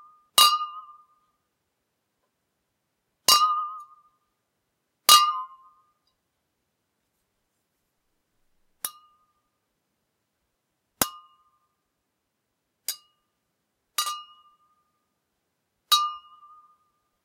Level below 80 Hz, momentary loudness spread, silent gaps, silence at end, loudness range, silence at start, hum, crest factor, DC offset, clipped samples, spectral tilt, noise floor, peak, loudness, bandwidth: -72 dBFS; 23 LU; none; 1.05 s; 22 LU; 0.35 s; none; 30 dB; under 0.1%; under 0.1%; 1.5 dB/octave; -79 dBFS; 0 dBFS; -21 LUFS; 16 kHz